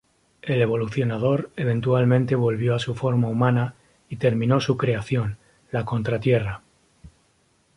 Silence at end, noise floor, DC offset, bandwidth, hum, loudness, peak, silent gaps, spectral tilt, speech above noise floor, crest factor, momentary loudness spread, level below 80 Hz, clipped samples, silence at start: 0.7 s; -64 dBFS; under 0.1%; 11 kHz; none; -23 LUFS; -6 dBFS; none; -8 dB/octave; 42 dB; 18 dB; 11 LU; -52 dBFS; under 0.1%; 0.45 s